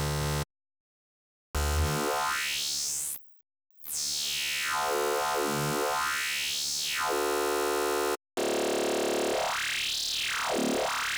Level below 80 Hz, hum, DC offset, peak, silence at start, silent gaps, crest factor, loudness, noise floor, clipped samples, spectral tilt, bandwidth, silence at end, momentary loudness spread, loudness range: -44 dBFS; none; under 0.1%; -20 dBFS; 0 s; 0.80-1.54 s; 12 dB; -29 LUFS; under -90 dBFS; under 0.1%; -2.5 dB/octave; over 20 kHz; 0 s; 4 LU; 3 LU